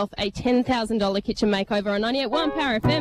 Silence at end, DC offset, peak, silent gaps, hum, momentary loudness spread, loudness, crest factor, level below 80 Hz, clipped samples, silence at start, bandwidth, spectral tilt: 0 s; under 0.1%; -10 dBFS; none; none; 3 LU; -23 LUFS; 12 dB; -46 dBFS; under 0.1%; 0 s; 12.5 kHz; -5.5 dB/octave